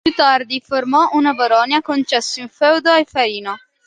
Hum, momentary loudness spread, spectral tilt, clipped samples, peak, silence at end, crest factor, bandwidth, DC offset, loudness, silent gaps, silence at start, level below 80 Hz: none; 7 LU; -2.5 dB/octave; under 0.1%; -2 dBFS; 0.3 s; 14 dB; 9.8 kHz; under 0.1%; -15 LUFS; none; 0.05 s; -58 dBFS